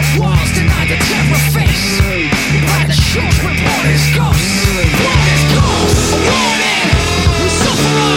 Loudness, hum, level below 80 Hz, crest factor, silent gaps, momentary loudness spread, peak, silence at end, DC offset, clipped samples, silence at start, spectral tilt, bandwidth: -11 LUFS; none; -20 dBFS; 12 dB; none; 2 LU; 0 dBFS; 0 s; under 0.1%; under 0.1%; 0 s; -4.5 dB/octave; 17 kHz